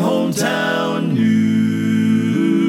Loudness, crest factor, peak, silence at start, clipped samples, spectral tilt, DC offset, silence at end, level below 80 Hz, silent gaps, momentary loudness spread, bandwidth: -17 LUFS; 10 dB; -6 dBFS; 0 s; under 0.1%; -6 dB/octave; under 0.1%; 0 s; -68 dBFS; none; 3 LU; 16 kHz